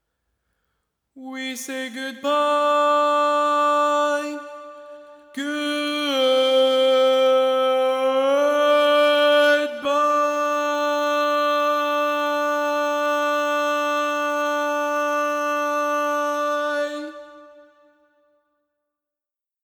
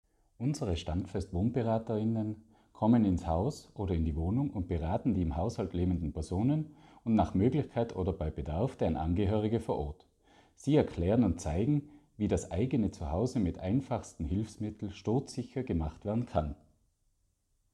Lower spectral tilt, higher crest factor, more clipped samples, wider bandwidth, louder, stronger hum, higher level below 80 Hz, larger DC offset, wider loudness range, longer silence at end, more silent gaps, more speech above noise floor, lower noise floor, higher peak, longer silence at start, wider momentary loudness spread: second, -0.5 dB/octave vs -8 dB/octave; second, 12 dB vs 18 dB; neither; first, over 20 kHz vs 11 kHz; first, -20 LUFS vs -33 LUFS; neither; second, -80 dBFS vs -46 dBFS; neither; first, 6 LU vs 3 LU; first, 2.2 s vs 1.2 s; neither; first, 68 dB vs 44 dB; first, -89 dBFS vs -75 dBFS; first, -8 dBFS vs -14 dBFS; first, 1.15 s vs 0.4 s; first, 12 LU vs 9 LU